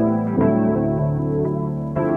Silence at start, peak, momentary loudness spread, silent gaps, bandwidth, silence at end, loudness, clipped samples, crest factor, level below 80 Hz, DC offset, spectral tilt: 0 s; -6 dBFS; 6 LU; none; 2.9 kHz; 0 s; -20 LUFS; under 0.1%; 12 dB; -42 dBFS; under 0.1%; -12 dB/octave